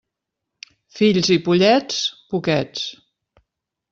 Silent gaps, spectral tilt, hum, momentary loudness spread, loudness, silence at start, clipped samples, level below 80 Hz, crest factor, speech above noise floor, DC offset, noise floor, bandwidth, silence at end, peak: none; -5 dB/octave; none; 13 LU; -19 LUFS; 0.95 s; under 0.1%; -60 dBFS; 18 dB; 63 dB; under 0.1%; -82 dBFS; 7.8 kHz; 1 s; -2 dBFS